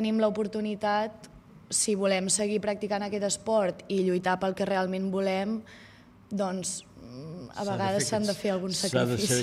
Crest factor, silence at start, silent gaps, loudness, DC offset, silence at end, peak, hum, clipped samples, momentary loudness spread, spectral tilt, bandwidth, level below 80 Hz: 18 dB; 0 s; none; -28 LUFS; under 0.1%; 0 s; -10 dBFS; none; under 0.1%; 11 LU; -4 dB/octave; 15.5 kHz; -64 dBFS